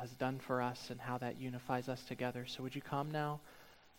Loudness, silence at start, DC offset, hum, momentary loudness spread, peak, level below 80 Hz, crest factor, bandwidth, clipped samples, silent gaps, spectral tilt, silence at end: -42 LUFS; 0 s; under 0.1%; none; 7 LU; -22 dBFS; -72 dBFS; 20 dB; 17 kHz; under 0.1%; none; -6 dB/octave; 0 s